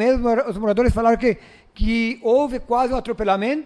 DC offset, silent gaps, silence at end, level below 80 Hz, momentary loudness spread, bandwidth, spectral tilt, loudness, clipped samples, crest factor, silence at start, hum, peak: under 0.1%; none; 0.05 s; -32 dBFS; 5 LU; 11 kHz; -7 dB/octave; -20 LUFS; under 0.1%; 14 dB; 0 s; none; -6 dBFS